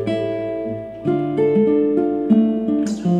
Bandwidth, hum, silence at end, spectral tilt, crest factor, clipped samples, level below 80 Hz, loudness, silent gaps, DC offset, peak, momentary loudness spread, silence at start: 9.2 kHz; none; 0 s; -8.5 dB/octave; 14 dB; under 0.1%; -54 dBFS; -19 LUFS; none; under 0.1%; -6 dBFS; 9 LU; 0 s